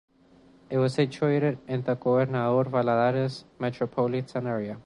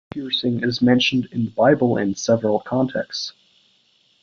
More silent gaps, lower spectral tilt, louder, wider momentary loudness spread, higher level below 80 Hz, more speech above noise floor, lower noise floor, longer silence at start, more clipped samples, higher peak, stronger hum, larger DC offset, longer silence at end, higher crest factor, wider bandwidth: neither; first, -8 dB/octave vs -5.5 dB/octave; second, -27 LUFS vs -20 LUFS; about the same, 7 LU vs 9 LU; second, -64 dBFS vs -58 dBFS; second, 31 dB vs 41 dB; second, -57 dBFS vs -61 dBFS; first, 0.7 s vs 0.15 s; neither; second, -10 dBFS vs -2 dBFS; neither; neither; second, 0.05 s vs 0.95 s; about the same, 16 dB vs 18 dB; first, 10.5 kHz vs 7.4 kHz